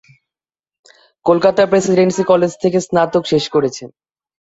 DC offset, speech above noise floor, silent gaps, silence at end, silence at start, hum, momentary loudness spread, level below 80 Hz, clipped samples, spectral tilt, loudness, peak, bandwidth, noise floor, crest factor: under 0.1%; over 76 dB; none; 0.55 s; 1.25 s; none; 6 LU; -56 dBFS; under 0.1%; -5.5 dB/octave; -15 LUFS; -2 dBFS; 8 kHz; under -90 dBFS; 14 dB